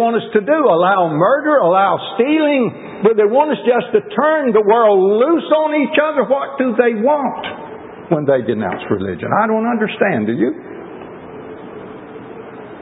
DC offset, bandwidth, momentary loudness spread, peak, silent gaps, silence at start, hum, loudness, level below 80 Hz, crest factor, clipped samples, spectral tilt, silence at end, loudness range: under 0.1%; 4 kHz; 20 LU; 0 dBFS; none; 0 s; none; -15 LUFS; -56 dBFS; 16 dB; under 0.1%; -11.5 dB/octave; 0 s; 5 LU